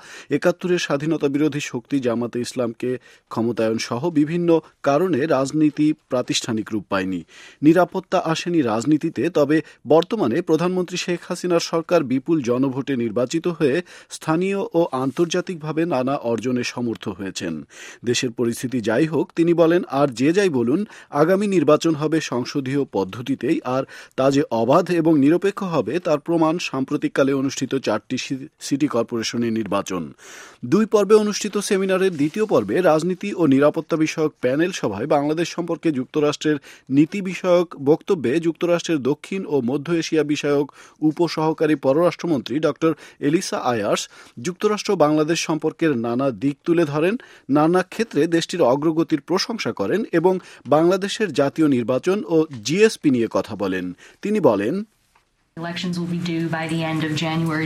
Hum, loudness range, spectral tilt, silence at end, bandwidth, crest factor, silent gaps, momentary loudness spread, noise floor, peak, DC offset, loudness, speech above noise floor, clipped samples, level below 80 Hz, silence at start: none; 4 LU; -5.5 dB/octave; 0 s; 14.5 kHz; 18 dB; none; 8 LU; -62 dBFS; -2 dBFS; under 0.1%; -21 LUFS; 42 dB; under 0.1%; -64 dBFS; 0.05 s